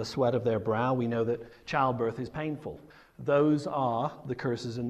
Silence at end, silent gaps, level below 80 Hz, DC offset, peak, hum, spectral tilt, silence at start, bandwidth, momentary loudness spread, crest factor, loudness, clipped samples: 0 s; none; -62 dBFS; under 0.1%; -12 dBFS; none; -7 dB/octave; 0 s; 12.5 kHz; 10 LU; 16 dB; -30 LUFS; under 0.1%